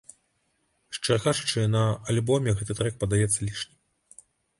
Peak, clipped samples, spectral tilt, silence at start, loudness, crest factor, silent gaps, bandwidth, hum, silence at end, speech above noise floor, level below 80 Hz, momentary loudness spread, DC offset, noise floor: -10 dBFS; under 0.1%; -4.5 dB/octave; 0.9 s; -26 LUFS; 18 dB; none; 11.5 kHz; none; 0.95 s; 47 dB; -50 dBFS; 9 LU; under 0.1%; -72 dBFS